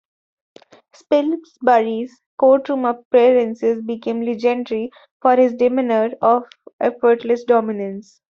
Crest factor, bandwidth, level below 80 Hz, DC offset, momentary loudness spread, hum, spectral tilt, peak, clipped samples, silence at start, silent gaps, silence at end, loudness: 16 dB; 7 kHz; -66 dBFS; under 0.1%; 10 LU; none; -6.5 dB/octave; -2 dBFS; under 0.1%; 1.1 s; 2.26-2.38 s, 3.05-3.11 s, 5.11-5.20 s, 6.73-6.79 s; 0.3 s; -18 LUFS